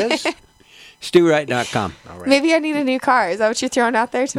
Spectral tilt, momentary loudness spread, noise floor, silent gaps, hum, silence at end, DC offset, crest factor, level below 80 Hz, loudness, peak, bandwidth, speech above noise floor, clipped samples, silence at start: -4 dB/octave; 10 LU; -46 dBFS; none; none; 0 s; under 0.1%; 18 dB; -56 dBFS; -18 LUFS; -2 dBFS; 14 kHz; 28 dB; under 0.1%; 0 s